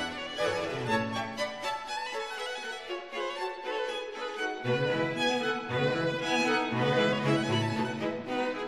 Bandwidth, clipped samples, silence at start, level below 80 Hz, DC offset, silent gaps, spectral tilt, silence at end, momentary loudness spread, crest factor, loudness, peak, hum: 13 kHz; under 0.1%; 0 s; -66 dBFS; under 0.1%; none; -5 dB/octave; 0 s; 9 LU; 16 dB; -31 LUFS; -14 dBFS; none